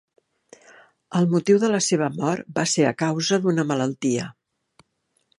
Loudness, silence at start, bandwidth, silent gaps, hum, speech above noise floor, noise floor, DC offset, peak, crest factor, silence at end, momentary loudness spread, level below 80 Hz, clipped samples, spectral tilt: -22 LUFS; 1.1 s; 11.5 kHz; none; none; 50 dB; -71 dBFS; under 0.1%; -4 dBFS; 18 dB; 1.1 s; 7 LU; -68 dBFS; under 0.1%; -5 dB/octave